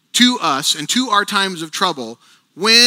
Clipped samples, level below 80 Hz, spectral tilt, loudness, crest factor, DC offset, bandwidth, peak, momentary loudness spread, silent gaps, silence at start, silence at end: under 0.1%; -72 dBFS; -1.5 dB/octave; -16 LUFS; 16 dB; under 0.1%; 18 kHz; 0 dBFS; 7 LU; none; 0.15 s; 0 s